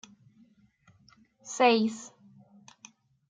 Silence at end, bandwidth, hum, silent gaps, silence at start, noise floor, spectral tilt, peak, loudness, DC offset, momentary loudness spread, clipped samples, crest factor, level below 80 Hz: 1.25 s; 9.4 kHz; none; none; 1.45 s; -63 dBFS; -3.5 dB/octave; -8 dBFS; -26 LUFS; under 0.1%; 27 LU; under 0.1%; 24 dB; -82 dBFS